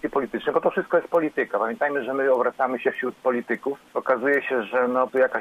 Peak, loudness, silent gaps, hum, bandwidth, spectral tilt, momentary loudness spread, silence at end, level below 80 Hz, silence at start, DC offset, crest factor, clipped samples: -6 dBFS; -24 LUFS; none; none; 7.2 kHz; -6.5 dB/octave; 5 LU; 0 s; -66 dBFS; 0.05 s; under 0.1%; 16 dB; under 0.1%